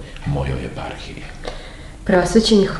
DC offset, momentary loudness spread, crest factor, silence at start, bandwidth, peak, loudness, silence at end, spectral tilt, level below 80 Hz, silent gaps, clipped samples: under 0.1%; 19 LU; 18 dB; 0 s; 12 kHz; -2 dBFS; -19 LUFS; 0 s; -5.5 dB/octave; -32 dBFS; none; under 0.1%